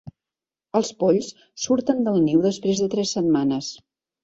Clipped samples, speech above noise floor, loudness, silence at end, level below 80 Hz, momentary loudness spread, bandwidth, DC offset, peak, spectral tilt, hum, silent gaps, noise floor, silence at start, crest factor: under 0.1%; 69 dB; -22 LUFS; 0.5 s; -62 dBFS; 9 LU; 8 kHz; under 0.1%; -6 dBFS; -5.5 dB/octave; none; none; -90 dBFS; 0.05 s; 16 dB